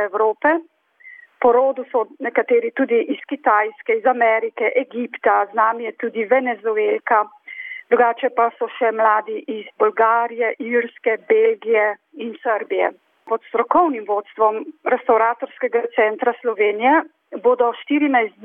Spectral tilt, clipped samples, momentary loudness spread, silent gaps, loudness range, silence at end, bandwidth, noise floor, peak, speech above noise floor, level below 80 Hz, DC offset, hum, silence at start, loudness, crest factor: -7.5 dB/octave; under 0.1%; 9 LU; none; 2 LU; 0.15 s; 3.7 kHz; -45 dBFS; -4 dBFS; 27 dB; -70 dBFS; under 0.1%; none; 0 s; -19 LUFS; 14 dB